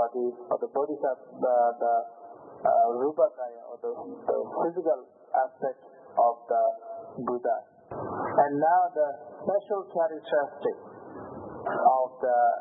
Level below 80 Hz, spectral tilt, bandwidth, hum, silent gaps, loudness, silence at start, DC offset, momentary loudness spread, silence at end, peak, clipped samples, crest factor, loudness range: -76 dBFS; -10 dB/octave; 3.9 kHz; none; none; -28 LUFS; 0 s; under 0.1%; 16 LU; 0 s; -10 dBFS; under 0.1%; 18 dB; 2 LU